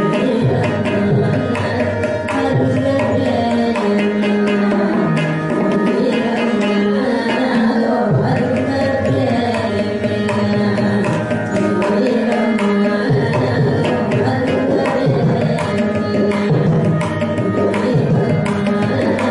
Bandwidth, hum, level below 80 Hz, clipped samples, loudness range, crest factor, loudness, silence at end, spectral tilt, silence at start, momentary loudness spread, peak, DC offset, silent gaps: 11 kHz; none; -48 dBFS; under 0.1%; 1 LU; 12 dB; -16 LUFS; 0 s; -7.5 dB/octave; 0 s; 3 LU; -4 dBFS; under 0.1%; none